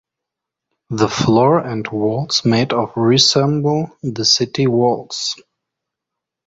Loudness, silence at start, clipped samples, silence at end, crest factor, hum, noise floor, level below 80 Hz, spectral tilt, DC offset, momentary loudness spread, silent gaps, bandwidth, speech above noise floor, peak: -16 LUFS; 0.9 s; under 0.1%; 1.15 s; 16 dB; none; -83 dBFS; -52 dBFS; -4.5 dB/octave; under 0.1%; 10 LU; none; 8 kHz; 67 dB; 0 dBFS